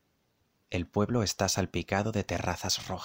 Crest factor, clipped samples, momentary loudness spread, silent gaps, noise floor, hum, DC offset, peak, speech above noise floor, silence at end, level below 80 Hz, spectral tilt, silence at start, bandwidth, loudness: 20 dB; under 0.1%; 5 LU; none; -73 dBFS; none; under 0.1%; -12 dBFS; 43 dB; 0 s; -52 dBFS; -4 dB/octave; 0.7 s; 16 kHz; -31 LUFS